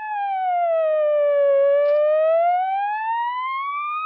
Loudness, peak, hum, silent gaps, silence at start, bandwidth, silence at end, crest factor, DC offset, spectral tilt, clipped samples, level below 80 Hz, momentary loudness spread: -20 LUFS; -12 dBFS; none; none; 0 s; 4.5 kHz; 0 s; 8 dB; under 0.1%; 6.5 dB/octave; under 0.1%; under -90 dBFS; 8 LU